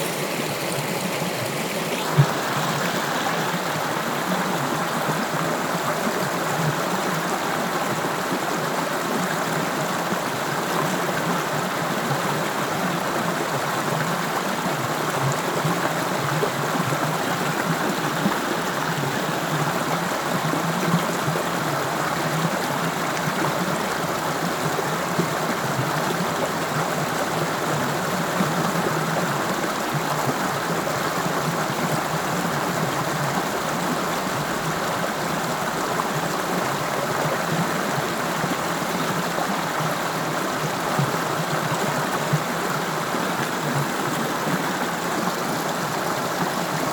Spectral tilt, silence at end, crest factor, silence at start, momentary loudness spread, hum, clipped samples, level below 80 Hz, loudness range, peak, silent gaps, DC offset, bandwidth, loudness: -4 dB/octave; 0 s; 18 dB; 0 s; 2 LU; none; under 0.1%; -58 dBFS; 1 LU; -6 dBFS; none; under 0.1%; 19.5 kHz; -23 LUFS